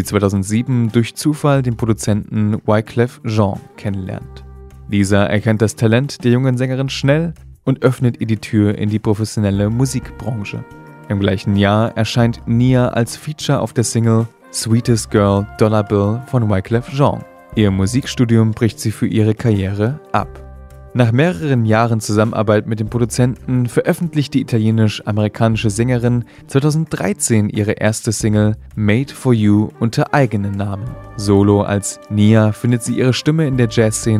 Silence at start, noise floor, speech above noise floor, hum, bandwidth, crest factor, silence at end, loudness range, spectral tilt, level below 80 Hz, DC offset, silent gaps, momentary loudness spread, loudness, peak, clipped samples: 0 s; -36 dBFS; 21 dB; none; 14.5 kHz; 16 dB; 0 s; 2 LU; -6.5 dB/octave; -40 dBFS; under 0.1%; none; 8 LU; -16 LUFS; 0 dBFS; under 0.1%